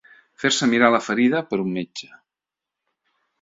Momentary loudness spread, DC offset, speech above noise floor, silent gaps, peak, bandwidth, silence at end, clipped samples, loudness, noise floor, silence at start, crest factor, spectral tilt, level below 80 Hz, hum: 14 LU; under 0.1%; 67 dB; none; -2 dBFS; 7.8 kHz; 1.4 s; under 0.1%; -20 LUFS; -87 dBFS; 0.4 s; 20 dB; -4 dB/octave; -66 dBFS; none